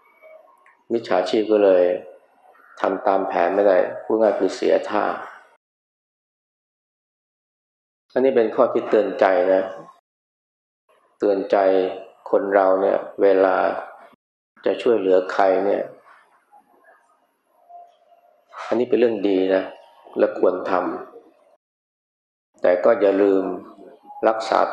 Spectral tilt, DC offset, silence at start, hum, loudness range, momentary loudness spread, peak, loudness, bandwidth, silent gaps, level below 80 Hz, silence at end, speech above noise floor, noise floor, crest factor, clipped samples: -6 dB/octave; under 0.1%; 0.9 s; none; 7 LU; 12 LU; -2 dBFS; -20 LUFS; 8.6 kHz; 5.56-8.09 s, 9.99-10.88 s, 14.15-14.55 s, 21.56-22.53 s; -80 dBFS; 0 s; 45 dB; -63 dBFS; 20 dB; under 0.1%